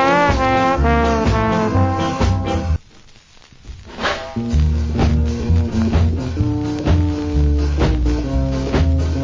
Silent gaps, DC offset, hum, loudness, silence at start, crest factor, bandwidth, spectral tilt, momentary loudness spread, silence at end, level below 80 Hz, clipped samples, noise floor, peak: none; under 0.1%; none; -18 LUFS; 0 s; 14 dB; 7.6 kHz; -7 dB/octave; 6 LU; 0 s; -20 dBFS; under 0.1%; -45 dBFS; -2 dBFS